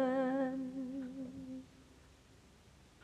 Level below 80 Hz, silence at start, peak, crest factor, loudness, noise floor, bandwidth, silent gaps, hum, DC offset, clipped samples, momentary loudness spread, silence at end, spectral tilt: -70 dBFS; 0 s; -24 dBFS; 18 dB; -40 LUFS; -63 dBFS; 9.8 kHz; none; none; under 0.1%; under 0.1%; 25 LU; 0.15 s; -7 dB/octave